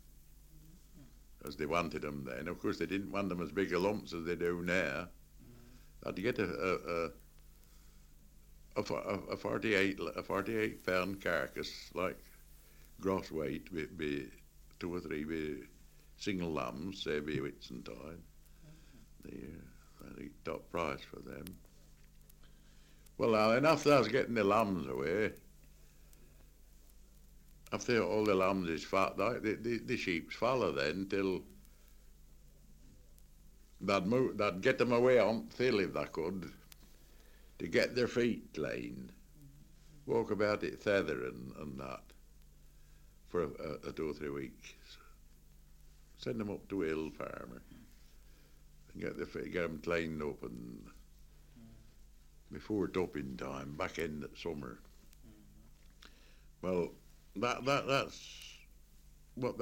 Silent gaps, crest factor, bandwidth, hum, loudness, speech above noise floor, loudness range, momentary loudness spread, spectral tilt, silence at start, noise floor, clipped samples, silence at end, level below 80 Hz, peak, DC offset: none; 24 dB; 16.5 kHz; none; -36 LUFS; 24 dB; 11 LU; 19 LU; -5.5 dB/octave; 0.05 s; -60 dBFS; under 0.1%; 0 s; -60 dBFS; -14 dBFS; under 0.1%